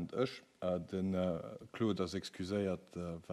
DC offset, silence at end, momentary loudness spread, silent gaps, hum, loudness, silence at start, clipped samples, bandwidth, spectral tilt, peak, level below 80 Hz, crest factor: under 0.1%; 0 s; 8 LU; none; none; -39 LUFS; 0 s; under 0.1%; 13 kHz; -6.5 dB/octave; -22 dBFS; -66 dBFS; 18 dB